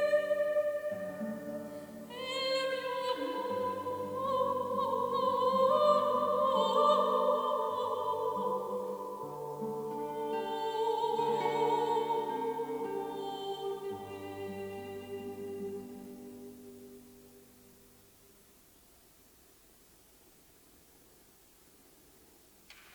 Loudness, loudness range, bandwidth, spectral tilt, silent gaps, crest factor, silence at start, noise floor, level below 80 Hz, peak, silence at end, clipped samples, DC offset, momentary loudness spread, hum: -33 LUFS; 16 LU; over 20 kHz; -4.5 dB/octave; none; 20 dB; 0 s; -62 dBFS; -74 dBFS; -14 dBFS; 0 s; under 0.1%; under 0.1%; 16 LU; none